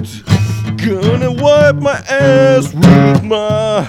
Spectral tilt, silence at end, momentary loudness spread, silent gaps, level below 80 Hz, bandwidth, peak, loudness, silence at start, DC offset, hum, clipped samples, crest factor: -6.5 dB/octave; 0 s; 8 LU; none; -38 dBFS; 14 kHz; 0 dBFS; -11 LUFS; 0 s; under 0.1%; none; 0.7%; 10 dB